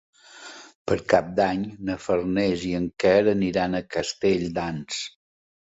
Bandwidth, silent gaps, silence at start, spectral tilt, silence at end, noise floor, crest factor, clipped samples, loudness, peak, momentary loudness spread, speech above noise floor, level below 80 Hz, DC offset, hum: 8 kHz; 0.75-0.86 s; 0.35 s; -5.5 dB/octave; 0.65 s; -44 dBFS; 22 dB; under 0.1%; -24 LUFS; -4 dBFS; 17 LU; 21 dB; -52 dBFS; under 0.1%; none